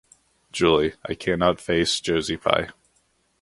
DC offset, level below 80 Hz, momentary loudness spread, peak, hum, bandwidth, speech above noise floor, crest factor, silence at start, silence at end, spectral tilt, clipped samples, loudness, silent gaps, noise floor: under 0.1%; -48 dBFS; 8 LU; -2 dBFS; none; 11.5 kHz; 44 dB; 22 dB; 0.55 s; 0.7 s; -4 dB/octave; under 0.1%; -22 LUFS; none; -67 dBFS